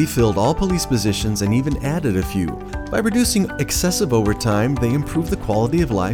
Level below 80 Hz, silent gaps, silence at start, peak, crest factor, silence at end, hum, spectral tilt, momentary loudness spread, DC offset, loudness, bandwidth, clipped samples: -32 dBFS; none; 0 s; -4 dBFS; 14 dB; 0 s; none; -5.5 dB/octave; 5 LU; under 0.1%; -19 LUFS; 19.5 kHz; under 0.1%